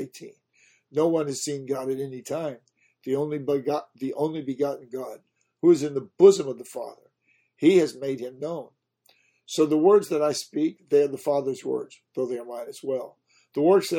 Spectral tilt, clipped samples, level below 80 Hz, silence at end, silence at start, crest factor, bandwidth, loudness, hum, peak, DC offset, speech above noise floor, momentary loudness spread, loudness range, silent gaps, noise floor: -5.5 dB/octave; under 0.1%; -74 dBFS; 0 s; 0 s; 22 dB; 16.5 kHz; -25 LUFS; none; -4 dBFS; under 0.1%; 44 dB; 17 LU; 7 LU; none; -68 dBFS